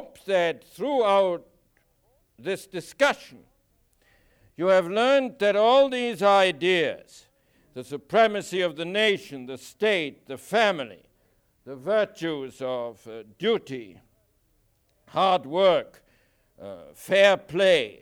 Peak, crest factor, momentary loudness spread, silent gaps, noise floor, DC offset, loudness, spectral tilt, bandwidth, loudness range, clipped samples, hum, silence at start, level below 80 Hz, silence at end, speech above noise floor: -6 dBFS; 18 dB; 20 LU; none; -67 dBFS; under 0.1%; -23 LUFS; -4 dB/octave; 16 kHz; 8 LU; under 0.1%; none; 0 s; -68 dBFS; 0.1 s; 43 dB